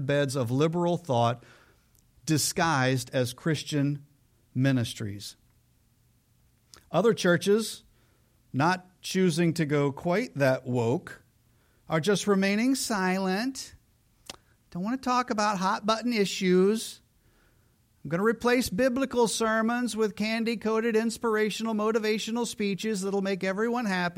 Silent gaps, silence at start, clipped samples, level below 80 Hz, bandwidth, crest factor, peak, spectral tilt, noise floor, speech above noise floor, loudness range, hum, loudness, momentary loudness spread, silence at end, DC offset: none; 0 s; under 0.1%; -62 dBFS; 16.5 kHz; 16 dB; -10 dBFS; -5 dB/octave; -65 dBFS; 39 dB; 3 LU; none; -27 LUFS; 11 LU; 0.05 s; under 0.1%